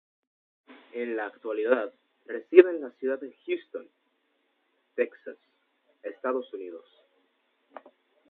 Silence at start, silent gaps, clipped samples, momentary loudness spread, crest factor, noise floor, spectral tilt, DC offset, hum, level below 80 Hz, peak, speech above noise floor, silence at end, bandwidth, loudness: 0.95 s; none; under 0.1%; 23 LU; 30 dB; -74 dBFS; -7.5 dB/octave; under 0.1%; none; under -90 dBFS; 0 dBFS; 46 dB; 1.5 s; 4 kHz; -27 LUFS